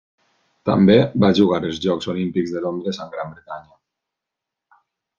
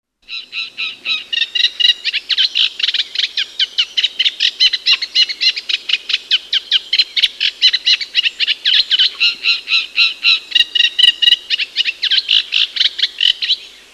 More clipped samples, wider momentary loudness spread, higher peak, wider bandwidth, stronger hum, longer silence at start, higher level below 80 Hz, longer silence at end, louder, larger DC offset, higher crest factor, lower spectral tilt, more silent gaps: neither; first, 18 LU vs 7 LU; about the same, -2 dBFS vs 0 dBFS; second, 7.4 kHz vs 13 kHz; second, none vs 50 Hz at -65 dBFS; first, 0.65 s vs 0.3 s; first, -56 dBFS vs -64 dBFS; first, 1.55 s vs 0.25 s; second, -19 LUFS vs -13 LUFS; neither; about the same, 20 dB vs 16 dB; first, -7.5 dB/octave vs 3.5 dB/octave; neither